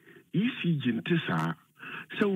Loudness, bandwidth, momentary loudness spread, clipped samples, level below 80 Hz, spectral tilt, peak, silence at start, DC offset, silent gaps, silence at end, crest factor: -30 LUFS; 9.2 kHz; 13 LU; under 0.1%; -76 dBFS; -7.5 dB/octave; -12 dBFS; 0.15 s; under 0.1%; none; 0 s; 18 dB